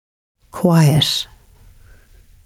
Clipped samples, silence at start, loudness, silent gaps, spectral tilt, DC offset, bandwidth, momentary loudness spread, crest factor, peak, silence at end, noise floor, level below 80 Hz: under 0.1%; 0.55 s; -15 LUFS; none; -5.5 dB/octave; under 0.1%; 15.5 kHz; 19 LU; 16 dB; -2 dBFS; 1.2 s; -47 dBFS; -46 dBFS